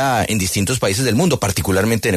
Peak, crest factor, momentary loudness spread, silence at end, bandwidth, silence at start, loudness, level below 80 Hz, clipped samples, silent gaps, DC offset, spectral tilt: -4 dBFS; 12 dB; 2 LU; 0 s; 14 kHz; 0 s; -17 LUFS; -40 dBFS; under 0.1%; none; under 0.1%; -4.5 dB/octave